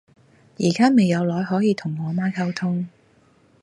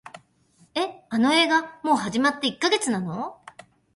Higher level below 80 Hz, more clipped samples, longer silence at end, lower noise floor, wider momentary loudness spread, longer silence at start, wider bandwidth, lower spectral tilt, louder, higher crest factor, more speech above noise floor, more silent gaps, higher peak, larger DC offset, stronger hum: about the same, -64 dBFS vs -66 dBFS; neither; first, 0.75 s vs 0.6 s; about the same, -57 dBFS vs -60 dBFS; second, 9 LU vs 12 LU; first, 0.6 s vs 0.05 s; about the same, 11.5 kHz vs 11.5 kHz; first, -6.5 dB/octave vs -3.5 dB/octave; about the same, -21 LUFS vs -23 LUFS; about the same, 16 dB vs 18 dB; about the same, 37 dB vs 37 dB; neither; about the same, -6 dBFS vs -8 dBFS; neither; neither